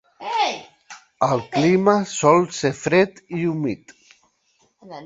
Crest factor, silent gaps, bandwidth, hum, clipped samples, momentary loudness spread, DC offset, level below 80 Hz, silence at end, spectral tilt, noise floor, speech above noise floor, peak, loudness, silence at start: 20 dB; none; 8 kHz; none; under 0.1%; 11 LU; under 0.1%; -60 dBFS; 0 s; -5 dB/octave; -64 dBFS; 45 dB; -2 dBFS; -20 LUFS; 0.2 s